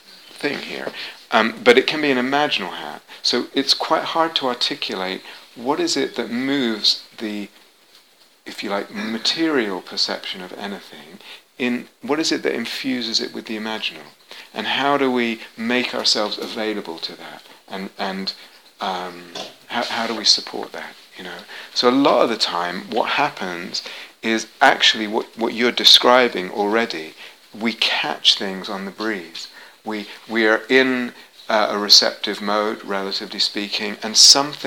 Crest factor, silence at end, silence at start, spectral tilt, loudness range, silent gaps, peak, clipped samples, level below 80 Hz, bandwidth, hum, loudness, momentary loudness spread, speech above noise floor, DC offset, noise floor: 20 dB; 0 s; 0.1 s; -2 dB/octave; 8 LU; none; 0 dBFS; under 0.1%; -72 dBFS; over 20 kHz; none; -19 LUFS; 18 LU; 33 dB; under 0.1%; -53 dBFS